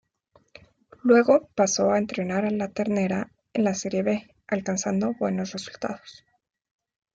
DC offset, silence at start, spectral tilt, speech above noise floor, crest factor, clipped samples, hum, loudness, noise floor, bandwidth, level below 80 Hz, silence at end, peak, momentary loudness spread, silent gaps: under 0.1%; 1.05 s; -5 dB/octave; 39 dB; 20 dB; under 0.1%; none; -25 LUFS; -63 dBFS; 8 kHz; -64 dBFS; 1 s; -6 dBFS; 12 LU; none